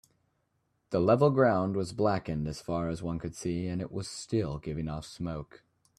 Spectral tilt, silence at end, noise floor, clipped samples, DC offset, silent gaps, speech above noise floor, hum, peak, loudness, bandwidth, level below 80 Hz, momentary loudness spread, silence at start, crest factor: -7 dB/octave; 0.55 s; -76 dBFS; under 0.1%; under 0.1%; none; 46 dB; none; -10 dBFS; -31 LUFS; 13.5 kHz; -54 dBFS; 14 LU; 0.9 s; 20 dB